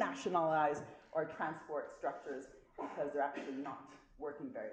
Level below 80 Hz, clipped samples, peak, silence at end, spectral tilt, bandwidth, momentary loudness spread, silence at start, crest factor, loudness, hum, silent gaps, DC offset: -74 dBFS; under 0.1%; -20 dBFS; 0 s; -5.5 dB/octave; 9.4 kHz; 14 LU; 0 s; 20 dB; -40 LUFS; none; none; under 0.1%